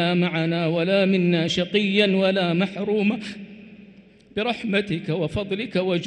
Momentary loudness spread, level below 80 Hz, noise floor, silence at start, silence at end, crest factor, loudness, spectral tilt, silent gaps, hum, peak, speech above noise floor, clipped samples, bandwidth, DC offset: 8 LU; -54 dBFS; -49 dBFS; 0 s; 0 s; 18 dB; -22 LUFS; -6.5 dB/octave; none; none; -6 dBFS; 28 dB; under 0.1%; 9.2 kHz; under 0.1%